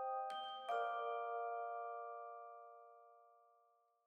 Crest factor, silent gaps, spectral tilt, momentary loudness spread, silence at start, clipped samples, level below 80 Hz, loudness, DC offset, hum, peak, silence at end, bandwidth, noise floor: 16 dB; none; -1 dB/octave; 18 LU; 0 s; under 0.1%; under -90 dBFS; -45 LUFS; under 0.1%; none; -30 dBFS; 0.65 s; 10.5 kHz; -77 dBFS